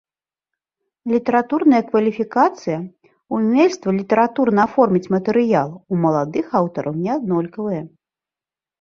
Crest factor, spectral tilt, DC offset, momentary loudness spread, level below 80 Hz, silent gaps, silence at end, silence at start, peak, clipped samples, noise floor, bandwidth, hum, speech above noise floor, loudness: 18 dB; -7.5 dB/octave; under 0.1%; 10 LU; -62 dBFS; none; 0.95 s; 1.05 s; -2 dBFS; under 0.1%; under -90 dBFS; 7.4 kHz; none; over 72 dB; -18 LUFS